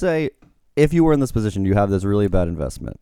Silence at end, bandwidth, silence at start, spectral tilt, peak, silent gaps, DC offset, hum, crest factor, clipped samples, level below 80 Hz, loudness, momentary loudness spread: 0.1 s; 15 kHz; 0 s; -7.5 dB/octave; -2 dBFS; none; under 0.1%; none; 18 dB; under 0.1%; -32 dBFS; -20 LUFS; 11 LU